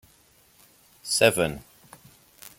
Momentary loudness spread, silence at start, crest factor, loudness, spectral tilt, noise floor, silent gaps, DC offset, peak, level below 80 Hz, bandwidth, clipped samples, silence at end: 22 LU; 1.05 s; 24 dB; -23 LUFS; -3 dB/octave; -59 dBFS; none; under 0.1%; -4 dBFS; -58 dBFS; 17 kHz; under 0.1%; 0.1 s